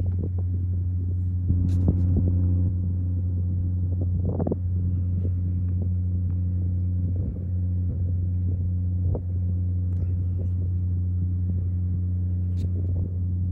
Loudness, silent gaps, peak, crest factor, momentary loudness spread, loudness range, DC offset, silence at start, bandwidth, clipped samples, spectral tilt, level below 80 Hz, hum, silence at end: -26 LUFS; none; -8 dBFS; 16 dB; 4 LU; 2 LU; under 0.1%; 0 s; 1.2 kHz; under 0.1%; -12.5 dB/octave; -36 dBFS; none; 0 s